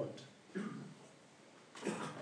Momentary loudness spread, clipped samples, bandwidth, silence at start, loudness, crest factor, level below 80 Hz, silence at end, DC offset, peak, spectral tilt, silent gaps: 18 LU; under 0.1%; 10.5 kHz; 0 s; -47 LUFS; 22 dB; under -90 dBFS; 0 s; under 0.1%; -26 dBFS; -5 dB/octave; none